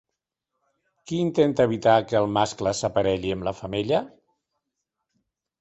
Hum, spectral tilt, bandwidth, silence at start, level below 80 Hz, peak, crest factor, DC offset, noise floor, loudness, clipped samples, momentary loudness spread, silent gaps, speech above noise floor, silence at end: none; -5.5 dB/octave; 8.2 kHz; 1.05 s; -54 dBFS; -4 dBFS; 20 dB; under 0.1%; -84 dBFS; -23 LUFS; under 0.1%; 9 LU; none; 61 dB; 1.55 s